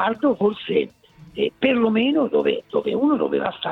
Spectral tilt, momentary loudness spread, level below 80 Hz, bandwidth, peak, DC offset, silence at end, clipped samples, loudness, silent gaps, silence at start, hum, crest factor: -7.5 dB/octave; 7 LU; -60 dBFS; 4.7 kHz; -4 dBFS; under 0.1%; 0 s; under 0.1%; -21 LUFS; none; 0 s; none; 16 dB